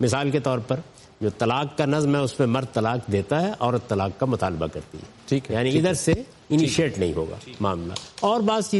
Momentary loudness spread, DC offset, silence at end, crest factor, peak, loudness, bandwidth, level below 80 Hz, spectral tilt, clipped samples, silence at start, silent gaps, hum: 9 LU; under 0.1%; 0 s; 16 dB; -8 dBFS; -24 LUFS; 11.5 kHz; -50 dBFS; -5.5 dB/octave; under 0.1%; 0 s; none; none